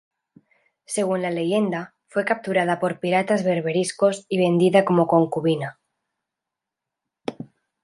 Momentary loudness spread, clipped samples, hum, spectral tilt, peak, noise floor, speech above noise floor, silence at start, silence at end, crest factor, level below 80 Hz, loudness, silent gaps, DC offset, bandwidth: 16 LU; under 0.1%; none; -6 dB/octave; -4 dBFS; -86 dBFS; 65 dB; 0.9 s; 0.4 s; 18 dB; -70 dBFS; -22 LUFS; none; under 0.1%; 11.5 kHz